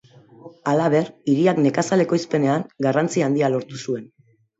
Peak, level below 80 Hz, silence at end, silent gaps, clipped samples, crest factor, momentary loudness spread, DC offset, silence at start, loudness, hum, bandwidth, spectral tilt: -6 dBFS; -66 dBFS; 0.55 s; none; under 0.1%; 16 dB; 10 LU; under 0.1%; 0.45 s; -21 LUFS; none; 8 kHz; -6.5 dB/octave